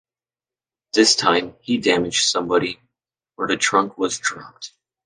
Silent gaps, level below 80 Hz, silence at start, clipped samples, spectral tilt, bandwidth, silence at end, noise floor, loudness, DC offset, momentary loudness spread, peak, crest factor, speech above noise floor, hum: none; -60 dBFS; 0.95 s; under 0.1%; -2 dB/octave; 10.5 kHz; 0.4 s; under -90 dBFS; -19 LUFS; under 0.1%; 20 LU; -2 dBFS; 20 dB; over 70 dB; none